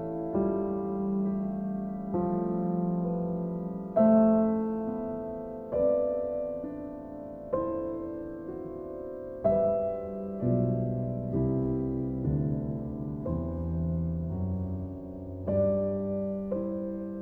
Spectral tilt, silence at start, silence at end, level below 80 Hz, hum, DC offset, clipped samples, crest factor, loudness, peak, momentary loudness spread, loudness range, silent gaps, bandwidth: -13 dB/octave; 0 s; 0 s; -48 dBFS; none; under 0.1%; under 0.1%; 18 dB; -31 LUFS; -12 dBFS; 12 LU; 5 LU; none; 2.8 kHz